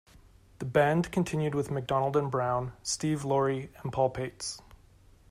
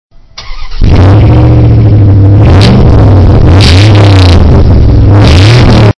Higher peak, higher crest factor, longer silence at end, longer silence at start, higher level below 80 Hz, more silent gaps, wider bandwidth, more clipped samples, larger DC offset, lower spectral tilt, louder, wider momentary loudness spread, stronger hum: second, -12 dBFS vs 0 dBFS; first, 18 dB vs 2 dB; first, 0.7 s vs 0.1 s; first, 0.6 s vs 0.4 s; second, -56 dBFS vs -8 dBFS; neither; first, 15 kHz vs 11 kHz; second, under 0.1% vs 30%; neither; second, -5.5 dB/octave vs -7 dB/octave; second, -30 LUFS vs -3 LUFS; first, 10 LU vs 2 LU; neither